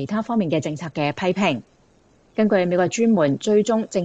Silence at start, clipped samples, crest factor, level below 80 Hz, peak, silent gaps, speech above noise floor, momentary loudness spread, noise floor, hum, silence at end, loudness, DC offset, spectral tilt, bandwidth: 0 s; under 0.1%; 14 dB; -62 dBFS; -6 dBFS; none; 37 dB; 7 LU; -57 dBFS; none; 0 s; -21 LUFS; under 0.1%; -6 dB/octave; 8 kHz